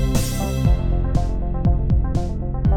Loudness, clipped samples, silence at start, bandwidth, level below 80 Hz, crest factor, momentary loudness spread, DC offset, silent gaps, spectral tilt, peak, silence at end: -22 LUFS; under 0.1%; 0 s; 17.5 kHz; -22 dBFS; 14 dB; 4 LU; under 0.1%; none; -6.5 dB/octave; -4 dBFS; 0 s